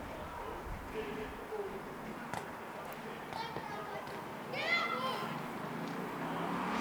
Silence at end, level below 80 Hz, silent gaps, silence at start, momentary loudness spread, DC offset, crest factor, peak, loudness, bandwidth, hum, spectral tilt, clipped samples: 0 s; -58 dBFS; none; 0 s; 11 LU; under 0.1%; 18 dB; -22 dBFS; -40 LUFS; over 20 kHz; none; -4.5 dB/octave; under 0.1%